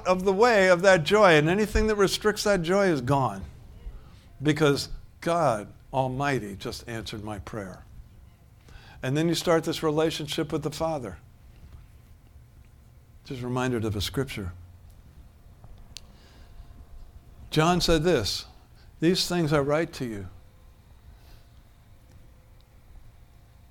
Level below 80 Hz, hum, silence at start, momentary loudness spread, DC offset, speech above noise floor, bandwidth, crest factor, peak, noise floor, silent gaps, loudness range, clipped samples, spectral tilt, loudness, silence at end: -44 dBFS; none; 0 s; 21 LU; under 0.1%; 29 dB; 18 kHz; 22 dB; -6 dBFS; -53 dBFS; none; 12 LU; under 0.1%; -5 dB/octave; -25 LUFS; 1.5 s